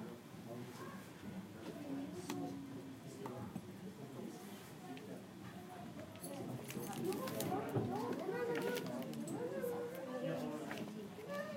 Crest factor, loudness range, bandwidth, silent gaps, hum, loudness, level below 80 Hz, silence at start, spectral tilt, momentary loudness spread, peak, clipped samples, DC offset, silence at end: 22 dB; 9 LU; 16.5 kHz; none; none; -46 LUFS; -78 dBFS; 0 s; -5.5 dB/octave; 11 LU; -22 dBFS; under 0.1%; under 0.1%; 0 s